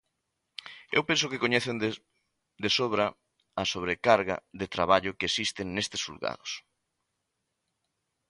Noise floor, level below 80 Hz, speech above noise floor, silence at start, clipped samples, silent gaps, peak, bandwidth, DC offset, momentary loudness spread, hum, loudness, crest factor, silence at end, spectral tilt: -82 dBFS; -60 dBFS; 53 dB; 0.65 s; under 0.1%; none; -8 dBFS; 11.5 kHz; under 0.1%; 14 LU; none; -28 LUFS; 24 dB; 1.7 s; -3.5 dB/octave